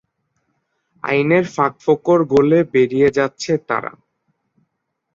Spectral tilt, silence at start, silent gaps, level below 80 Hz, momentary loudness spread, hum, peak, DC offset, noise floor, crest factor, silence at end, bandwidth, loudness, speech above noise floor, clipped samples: -6.5 dB/octave; 1.05 s; none; -54 dBFS; 9 LU; none; -2 dBFS; under 0.1%; -75 dBFS; 16 dB; 1.25 s; 7.6 kHz; -16 LUFS; 59 dB; under 0.1%